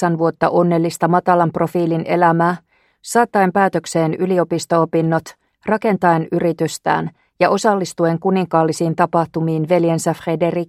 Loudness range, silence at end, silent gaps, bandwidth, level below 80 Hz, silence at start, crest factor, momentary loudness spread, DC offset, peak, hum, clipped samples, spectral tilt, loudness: 1 LU; 0.05 s; none; 15 kHz; -58 dBFS; 0 s; 16 dB; 5 LU; under 0.1%; 0 dBFS; none; under 0.1%; -6.5 dB/octave; -17 LUFS